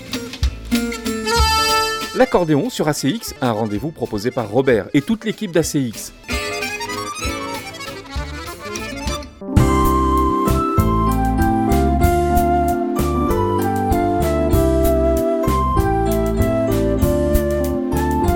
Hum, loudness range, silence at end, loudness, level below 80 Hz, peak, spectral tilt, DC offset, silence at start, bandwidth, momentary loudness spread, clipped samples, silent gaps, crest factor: none; 6 LU; 0 s; -18 LUFS; -26 dBFS; 0 dBFS; -5.5 dB/octave; under 0.1%; 0 s; 19 kHz; 10 LU; under 0.1%; none; 18 dB